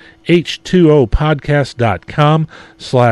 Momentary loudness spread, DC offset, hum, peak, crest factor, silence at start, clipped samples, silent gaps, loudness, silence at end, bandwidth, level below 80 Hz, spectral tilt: 7 LU; under 0.1%; none; 0 dBFS; 12 dB; 0.25 s; under 0.1%; none; -13 LUFS; 0 s; 11 kHz; -28 dBFS; -7 dB/octave